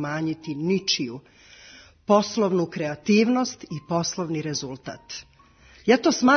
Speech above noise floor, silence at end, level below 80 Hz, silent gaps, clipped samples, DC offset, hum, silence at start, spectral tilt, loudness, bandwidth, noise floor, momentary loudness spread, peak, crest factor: 30 dB; 0 s; -62 dBFS; none; under 0.1%; under 0.1%; none; 0 s; -4.5 dB/octave; -24 LUFS; 6.6 kHz; -53 dBFS; 17 LU; -4 dBFS; 20 dB